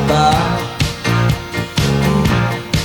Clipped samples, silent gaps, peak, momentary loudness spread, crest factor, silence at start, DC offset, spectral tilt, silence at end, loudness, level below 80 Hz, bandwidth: under 0.1%; none; 0 dBFS; 6 LU; 14 dB; 0 s; under 0.1%; -5.5 dB/octave; 0 s; -16 LUFS; -28 dBFS; 19 kHz